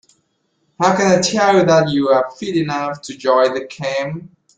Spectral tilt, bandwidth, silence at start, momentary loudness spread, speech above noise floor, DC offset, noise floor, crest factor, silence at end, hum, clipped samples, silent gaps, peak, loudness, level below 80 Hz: -4.5 dB/octave; 9.4 kHz; 0.8 s; 10 LU; 50 dB; under 0.1%; -66 dBFS; 16 dB; 0.3 s; none; under 0.1%; none; 0 dBFS; -16 LUFS; -56 dBFS